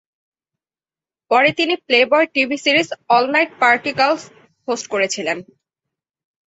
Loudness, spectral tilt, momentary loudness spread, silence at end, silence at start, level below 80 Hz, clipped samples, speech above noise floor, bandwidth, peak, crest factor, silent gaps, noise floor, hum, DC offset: -16 LUFS; -2.5 dB/octave; 10 LU; 1.1 s; 1.3 s; -66 dBFS; under 0.1%; over 73 dB; 8.2 kHz; -2 dBFS; 18 dB; none; under -90 dBFS; none; under 0.1%